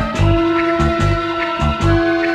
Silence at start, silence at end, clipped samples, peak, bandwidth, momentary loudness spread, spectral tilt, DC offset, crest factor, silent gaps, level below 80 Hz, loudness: 0 s; 0 s; under 0.1%; -2 dBFS; 10 kHz; 3 LU; -7 dB/octave; under 0.1%; 14 dB; none; -24 dBFS; -16 LUFS